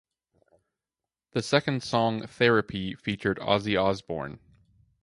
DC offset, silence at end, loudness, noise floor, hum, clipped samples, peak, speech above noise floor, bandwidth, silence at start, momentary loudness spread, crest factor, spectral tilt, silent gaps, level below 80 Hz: under 0.1%; 0.65 s; -27 LUFS; under -90 dBFS; none; under 0.1%; -6 dBFS; over 63 dB; 11.5 kHz; 1.35 s; 11 LU; 22 dB; -5.5 dB/octave; none; -56 dBFS